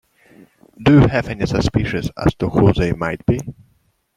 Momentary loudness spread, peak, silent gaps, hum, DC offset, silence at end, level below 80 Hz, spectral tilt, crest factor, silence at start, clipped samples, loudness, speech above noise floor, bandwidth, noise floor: 9 LU; -2 dBFS; none; none; under 0.1%; 0.65 s; -34 dBFS; -7.5 dB/octave; 16 dB; 0.8 s; under 0.1%; -17 LUFS; 45 dB; 11.5 kHz; -61 dBFS